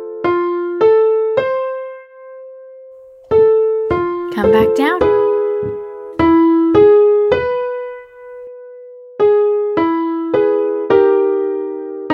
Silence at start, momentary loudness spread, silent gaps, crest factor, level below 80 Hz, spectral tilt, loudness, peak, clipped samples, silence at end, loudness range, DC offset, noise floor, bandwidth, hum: 0 s; 21 LU; none; 14 dB; -46 dBFS; -7.5 dB/octave; -14 LUFS; 0 dBFS; under 0.1%; 0 s; 5 LU; under 0.1%; -39 dBFS; 6.4 kHz; none